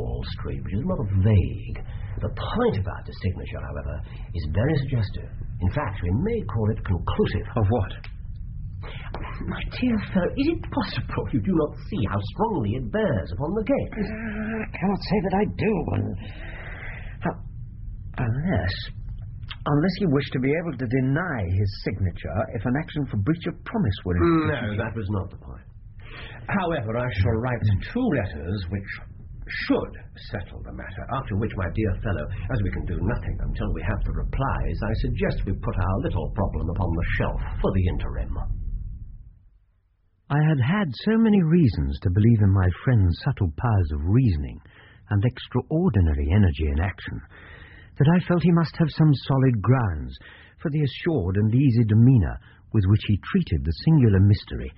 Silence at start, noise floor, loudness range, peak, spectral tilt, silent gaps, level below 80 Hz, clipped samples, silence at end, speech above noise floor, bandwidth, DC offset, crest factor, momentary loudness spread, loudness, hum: 0 s; -64 dBFS; 7 LU; -8 dBFS; -7.5 dB/octave; none; -34 dBFS; under 0.1%; 0.05 s; 41 dB; 5.8 kHz; under 0.1%; 16 dB; 16 LU; -24 LUFS; none